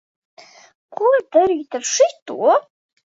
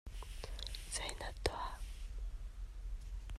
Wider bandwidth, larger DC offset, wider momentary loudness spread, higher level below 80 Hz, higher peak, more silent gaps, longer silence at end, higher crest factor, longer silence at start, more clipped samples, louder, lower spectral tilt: second, 8 kHz vs 13.5 kHz; neither; second, 6 LU vs 10 LU; second, -64 dBFS vs -46 dBFS; first, -2 dBFS vs -18 dBFS; first, 2.22-2.26 s vs none; first, 0.55 s vs 0 s; second, 16 dB vs 26 dB; first, 0.9 s vs 0.05 s; neither; first, -18 LUFS vs -45 LUFS; second, -1.5 dB/octave vs -3 dB/octave